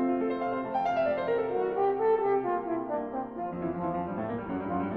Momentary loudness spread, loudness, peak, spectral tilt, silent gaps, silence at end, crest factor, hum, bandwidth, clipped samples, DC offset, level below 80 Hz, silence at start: 7 LU; -30 LUFS; -16 dBFS; -9 dB/octave; none; 0 s; 14 dB; none; 6.2 kHz; under 0.1%; under 0.1%; -60 dBFS; 0 s